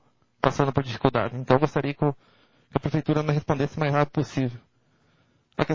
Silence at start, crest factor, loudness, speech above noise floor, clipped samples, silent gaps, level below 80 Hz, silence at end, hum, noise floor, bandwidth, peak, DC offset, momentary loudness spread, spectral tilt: 0.45 s; 24 dB; -25 LUFS; 40 dB; under 0.1%; none; -52 dBFS; 0 s; none; -65 dBFS; 7.4 kHz; -2 dBFS; under 0.1%; 7 LU; -7.5 dB/octave